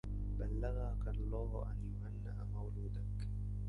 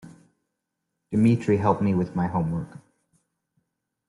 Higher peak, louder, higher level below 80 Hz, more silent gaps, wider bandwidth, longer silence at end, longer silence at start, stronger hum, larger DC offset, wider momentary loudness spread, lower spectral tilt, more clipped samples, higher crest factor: second, -28 dBFS vs -8 dBFS; second, -43 LUFS vs -24 LUFS; first, -42 dBFS vs -58 dBFS; neither; second, 4.7 kHz vs 11.5 kHz; second, 0 s vs 1.4 s; about the same, 0.05 s vs 0.05 s; first, 50 Hz at -40 dBFS vs none; neither; second, 4 LU vs 9 LU; about the same, -9.5 dB/octave vs -9 dB/octave; neither; second, 12 dB vs 18 dB